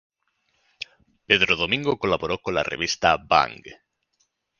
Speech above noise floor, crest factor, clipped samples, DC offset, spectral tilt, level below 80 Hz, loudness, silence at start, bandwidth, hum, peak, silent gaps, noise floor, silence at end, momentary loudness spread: 49 dB; 26 dB; under 0.1%; under 0.1%; -3.5 dB/octave; -52 dBFS; -22 LUFS; 1.3 s; 7.2 kHz; none; 0 dBFS; none; -72 dBFS; 0.85 s; 20 LU